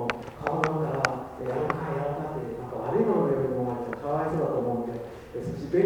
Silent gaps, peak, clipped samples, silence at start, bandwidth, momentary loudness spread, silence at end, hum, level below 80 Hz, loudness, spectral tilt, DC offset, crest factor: none; -4 dBFS; under 0.1%; 0 s; 19 kHz; 10 LU; 0 s; none; -54 dBFS; -29 LUFS; -7 dB/octave; under 0.1%; 24 dB